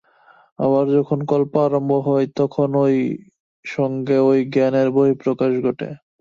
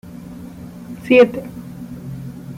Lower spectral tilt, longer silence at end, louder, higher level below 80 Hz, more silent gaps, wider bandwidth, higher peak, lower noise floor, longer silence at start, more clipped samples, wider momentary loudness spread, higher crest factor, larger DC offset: first, -9 dB/octave vs -7 dB/octave; first, 0.25 s vs 0 s; second, -18 LUFS vs -14 LUFS; second, -64 dBFS vs -50 dBFS; first, 3.40-3.63 s vs none; second, 7.2 kHz vs 15.5 kHz; about the same, -4 dBFS vs -2 dBFS; first, -53 dBFS vs -34 dBFS; first, 0.6 s vs 0.05 s; neither; second, 9 LU vs 23 LU; about the same, 16 dB vs 18 dB; neither